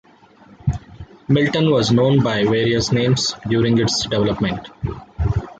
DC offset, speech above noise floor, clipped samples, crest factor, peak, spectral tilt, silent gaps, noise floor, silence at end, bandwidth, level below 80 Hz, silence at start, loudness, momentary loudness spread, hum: under 0.1%; 30 dB; under 0.1%; 14 dB; -4 dBFS; -5.5 dB/octave; none; -48 dBFS; 0.05 s; 9.2 kHz; -36 dBFS; 0.65 s; -18 LUFS; 12 LU; none